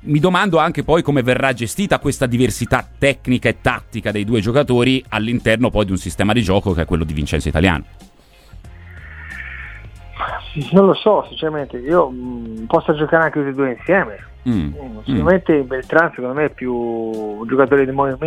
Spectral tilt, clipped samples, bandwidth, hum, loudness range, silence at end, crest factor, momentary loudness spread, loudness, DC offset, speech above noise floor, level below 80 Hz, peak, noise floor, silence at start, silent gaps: -6 dB/octave; under 0.1%; 15.5 kHz; none; 4 LU; 0 s; 18 dB; 12 LU; -17 LUFS; under 0.1%; 26 dB; -36 dBFS; 0 dBFS; -43 dBFS; 0.05 s; none